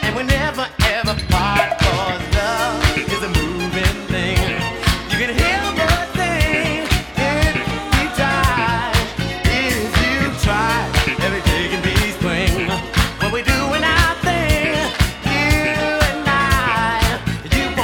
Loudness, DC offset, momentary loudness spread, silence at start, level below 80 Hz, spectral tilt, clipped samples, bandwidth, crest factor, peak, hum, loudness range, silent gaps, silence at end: -17 LUFS; under 0.1%; 4 LU; 0 s; -26 dBFS; -4.5 dB/octave; under 0.1%; over 20 kHz; 16 dB; 0 dBFS; none; 2 LU; none; 0 s